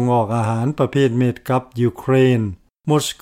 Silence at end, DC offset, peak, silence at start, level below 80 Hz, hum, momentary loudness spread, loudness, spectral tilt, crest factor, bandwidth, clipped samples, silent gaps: 0.1 s; under 0.1%; -4 dBFS; 0 s; -52 dBFS; none; 6 LU; -18 LUFS; -6.5 dB/octave; 12 dB; 16 kHz; under 0.1%; none